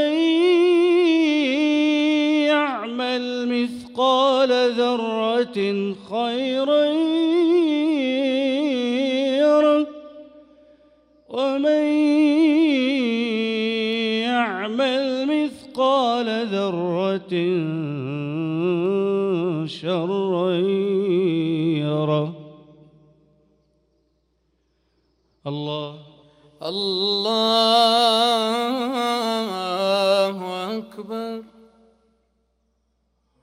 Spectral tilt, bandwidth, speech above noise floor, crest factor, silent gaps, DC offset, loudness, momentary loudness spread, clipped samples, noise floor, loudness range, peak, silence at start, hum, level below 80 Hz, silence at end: -5.5 dB/octave; 15 kHz; 49 dB; 16 dB; none; under 0.1%; -20 LUFS; 11 LU; under 0.1%; -69 dBFS; 8 LU; -4 dBFS; 0 s; none; -68 dBFS; 1.95 s